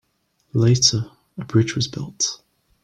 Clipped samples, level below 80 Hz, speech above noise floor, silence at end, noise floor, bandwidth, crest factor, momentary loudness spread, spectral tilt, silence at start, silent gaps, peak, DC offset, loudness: under 0.1%; -54 dBFS; 48 dB; 0.5 s; -68 dBFS; 9.4 kHz; 18 dB; 18 LU; -4 dB/octave; 0.55 s; none; -4 dBFS; under 0.1%; -20 LUFS